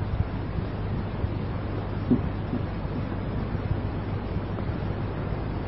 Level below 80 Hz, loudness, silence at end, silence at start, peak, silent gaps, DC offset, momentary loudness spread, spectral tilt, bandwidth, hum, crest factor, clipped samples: -36 dBFS; -30 LUFS; 0 s; 0 s; -10 dBFS; none; 0.4%; 5 LU; -8 dB/octave; 5.6 kHz; none; 18 dB; under 0.1%